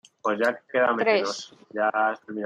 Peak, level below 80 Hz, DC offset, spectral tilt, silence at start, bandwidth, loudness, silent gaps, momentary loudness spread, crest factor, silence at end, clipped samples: -8 dBFS; -78 dBFS; under 0.1%; -3.5 dB/octave; 0.25 s; 12 kHz; -24 LUFS; none; 9 LU; 18 dB; 0 s; under 0.1%